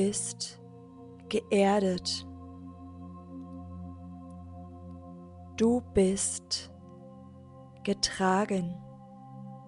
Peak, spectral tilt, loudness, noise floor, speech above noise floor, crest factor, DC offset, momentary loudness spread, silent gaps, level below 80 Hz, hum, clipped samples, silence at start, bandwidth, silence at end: -12 dBFS; -4.5 dB/octave; -29 LUFS; -50 dBFS; 22 dB; 20 dB; under 0.1%; 24 LU; none; -58 dBFS; none; under 0.1%; 0 s; 11 kHz; 0 s